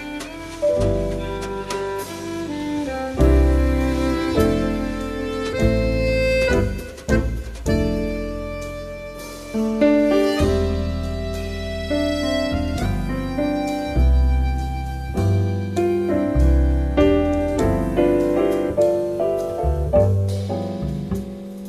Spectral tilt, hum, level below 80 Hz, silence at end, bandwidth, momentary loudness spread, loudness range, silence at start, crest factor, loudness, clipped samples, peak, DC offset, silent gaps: -7 dB/octave; none; -26 dBFS; 0 s; 14 kHz; 10 LU; 4 LU; 0 s; 16 dB; -21 LUFS; under 0.1%; -4 dBFS; under 0.1%; none